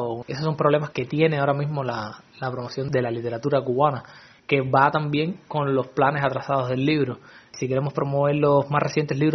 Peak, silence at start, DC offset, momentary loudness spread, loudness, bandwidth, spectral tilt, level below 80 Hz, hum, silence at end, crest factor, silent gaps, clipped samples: -4 dBFS; 0 s; under 0.1%; 11 LU; -23 LUFS; 6.4 kHz; -5.5 dB/octave; -60 dBFS; none; 0 s; 20 dB; none; under 0.1%